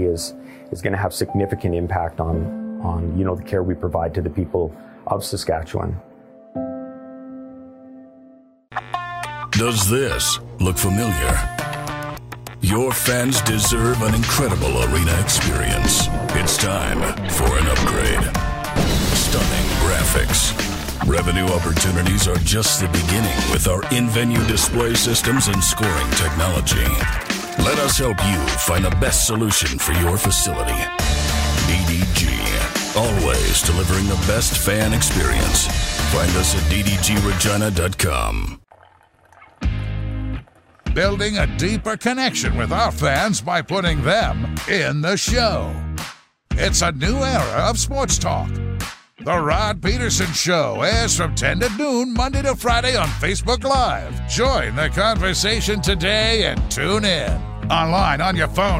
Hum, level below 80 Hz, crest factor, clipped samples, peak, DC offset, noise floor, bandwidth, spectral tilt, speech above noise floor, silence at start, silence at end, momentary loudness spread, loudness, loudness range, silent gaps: none; -26 dBFS; 16 dB; under 0.1%; -4 dBFS; under 0.1%; -52 dBFS; 16.5 kHz; -3.5 dB/octave; 34 dB; 0 s; 0 s; 10 LU; -19 LUFS; 6 LU; none